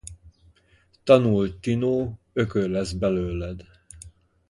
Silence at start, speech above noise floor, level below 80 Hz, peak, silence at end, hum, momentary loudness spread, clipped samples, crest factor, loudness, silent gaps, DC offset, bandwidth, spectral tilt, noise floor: 0.05 s; 38 dB; -44 dBFS; -4 dBFS; 0.4 s; none; 25 LU; under 0.1%; 22 dB; -24 LUFS; none; under 0.1%; 11.5 kHz; -7 dB/octave; -61 dBFS